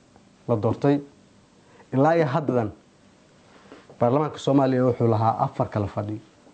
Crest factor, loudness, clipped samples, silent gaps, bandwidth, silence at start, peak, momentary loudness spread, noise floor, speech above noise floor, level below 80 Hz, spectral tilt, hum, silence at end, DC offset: 16 dB; -23 LUFS; under 0.1%; none; 8.8 kHz; 0.5 s; -8 dBFS; 11 LU; -55 dBFS; 33 dB; -60 dBFS; -8.5 dB/octave; none; 0.35 s; under 0.1%